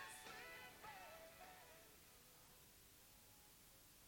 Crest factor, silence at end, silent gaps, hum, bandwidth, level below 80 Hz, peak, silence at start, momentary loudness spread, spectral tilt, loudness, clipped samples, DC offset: 18 dB; 0 s; none; none; 17 kHz; -78 dBFS; -44 dBFS; 0 s; 9 LU; -1.5 dB/octave; -60 LUFS; under 0.1%; under 0.1%